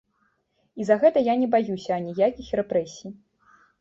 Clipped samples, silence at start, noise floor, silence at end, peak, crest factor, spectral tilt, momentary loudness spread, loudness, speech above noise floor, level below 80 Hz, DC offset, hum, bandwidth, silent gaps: under 0.1%; 0.75 s; -70 dBFS; 0.7 s; -6 dBFS; 18 dB; -6.5 dB/octave; 19 LU; -23 LUFS; 47 dB; -60 dBFS; under 0.1%; none; 7.8 kHz; none